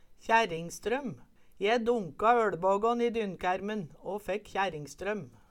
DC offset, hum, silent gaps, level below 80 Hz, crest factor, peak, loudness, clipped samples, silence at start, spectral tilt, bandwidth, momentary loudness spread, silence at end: under 0.1%; none; none; -58 dBFS; 18 dB; -12 dBFS; -31 LUFS; under 0.1%; 0.05 s; -5 dB/octave; 16 kHz; 11 LU; 0.25 s